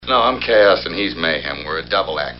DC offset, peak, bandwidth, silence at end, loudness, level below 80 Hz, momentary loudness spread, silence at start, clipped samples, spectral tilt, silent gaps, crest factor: 0.3%; -2 dBFS; 5.8 kHz; 0 s; -17 LUFS; -42 dBFS; 9 LU; 0 s; under 0.1%; -1 dB/octave; none; 16 dB